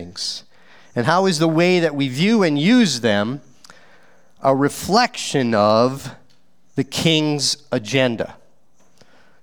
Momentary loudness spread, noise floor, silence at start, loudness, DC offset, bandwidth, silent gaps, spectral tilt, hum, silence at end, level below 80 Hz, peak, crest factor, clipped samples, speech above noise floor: 13 LU; -60 dBFS; 0 s; -18 LUFS; 0.5%; over 20 kHz; none; -4.5 dB/octave; none; 1.1 s; -58 dBFS; 0 dBFS; 18 dB; under 0.1%; 43 dB